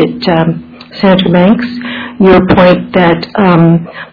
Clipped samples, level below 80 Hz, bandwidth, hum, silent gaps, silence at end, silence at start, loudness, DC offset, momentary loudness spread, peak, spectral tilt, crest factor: 2%; -34 dBFS; 5.4 kHz; none; none; 0.05 s; 0 s; -8 LUFS; under 0.1%; 12 LU; 0 dBFS; -9.5 dB/octave; 8 dB